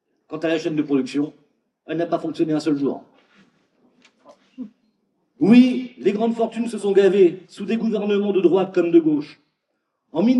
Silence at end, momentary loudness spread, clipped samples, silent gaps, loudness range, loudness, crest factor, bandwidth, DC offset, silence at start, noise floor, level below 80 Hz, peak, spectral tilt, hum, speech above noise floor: 0 s; 17 LU; under 0.1%; none; 8 LU; -20 LUFS; 18 dB; 11 kHz; under 0.1%; 0.3 s; -75 dBFS; -78 dBFS; -2 dBFS; -7 dB/octave; none; 56 dB